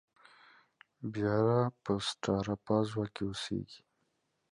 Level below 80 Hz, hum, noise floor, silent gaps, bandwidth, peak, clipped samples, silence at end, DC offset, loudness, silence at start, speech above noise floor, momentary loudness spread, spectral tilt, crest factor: -62 dBFS; none; -79 dBFS; none; 11.5 kHz; -16 dBFS; under 0.1%; 0.75 s; under 0.1%; -33 LUFS; 1 s; 46 dB; 11 LU; -6 dB/octave; 18 dB